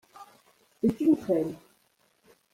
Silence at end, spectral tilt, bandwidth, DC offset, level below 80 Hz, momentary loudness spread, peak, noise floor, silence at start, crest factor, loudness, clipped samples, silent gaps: 0.95 s; -8.5 dB/octave; 15 kHz; under 0.1%; -64 dBFS; 12 LU; -14 dBFS; -68 dBFS; 0.2 s; 18 dB; -27 LUFS; under 0.1%; none